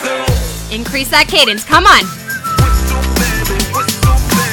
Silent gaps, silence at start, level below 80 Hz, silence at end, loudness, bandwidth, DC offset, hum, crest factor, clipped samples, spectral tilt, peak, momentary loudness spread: none; 0 s; -18 dBFS; 0 s; -12 LUFS; 20 kHz; under 0.1%; none; 12 dB; 0.3%; -3.5 dB/octave; 0 dBFS; 10 LU